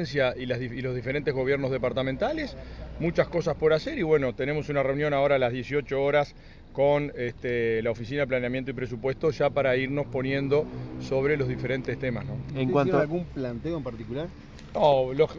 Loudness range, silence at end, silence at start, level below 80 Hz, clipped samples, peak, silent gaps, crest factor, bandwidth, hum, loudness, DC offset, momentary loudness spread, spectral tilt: 3 LU; 0 s; 0 s; -46 dBFS; under 0.1%; -8 dBFS; none; 18 dB; 7.2 kHz; none; -27 LUFS; under 0.1%; 10 LU; -7.5 dB/octave